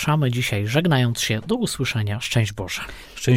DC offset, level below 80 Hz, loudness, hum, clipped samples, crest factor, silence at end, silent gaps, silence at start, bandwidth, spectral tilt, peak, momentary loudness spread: under 0.1%; -46 dBFS; -22 LUFS; none; under 0.1%; 16 dB; 0 s; none; 0 s; 16.5 kHz; -5 dB/octave; -6 dBFS; 9 LU